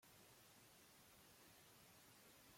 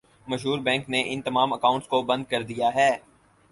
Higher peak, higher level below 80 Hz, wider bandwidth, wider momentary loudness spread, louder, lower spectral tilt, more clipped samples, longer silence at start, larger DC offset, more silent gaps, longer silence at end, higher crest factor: second, -56 dBFS vs -6 dBFS; second, -88 dBFS vs -62 dBFS; first, 16.5 kHz vs 11.5 kHz; second, 1 LU vs 7 LU; second, -67 LUFS vs -25 LUFS; second, -2.5 dB/octave vs -4.5 dB/octave; neither; second, 0 s vs 0.25 s; neither; neither; second, 0 s vs 0.5 s; second, 12 dB vs 18 dB